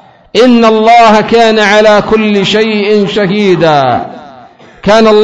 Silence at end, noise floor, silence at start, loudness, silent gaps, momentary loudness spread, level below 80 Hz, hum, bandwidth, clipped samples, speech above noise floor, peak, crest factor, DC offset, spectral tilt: 0 s; -35 dBFS; 0.35 s; -7 LUFS; none; 7 LU; -40 dBFS; none; 11 kHz; 2%; 29 dB; 0 dBFS; 6 dB; under 0.1%; -5 dB/octave